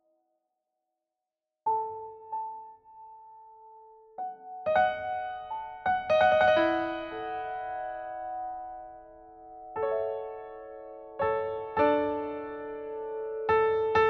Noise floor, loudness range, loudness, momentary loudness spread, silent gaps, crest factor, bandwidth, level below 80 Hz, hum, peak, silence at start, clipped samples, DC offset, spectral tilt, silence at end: -88 dBFS; 11 LU; -30 LUFS; 20 LU; none; 20 dB; 6.2 kHz; -62 dBFS; none; -12 dBFS; 1.65 s; under 0.1%; under 0.1%; -6 dB/octave; 0 s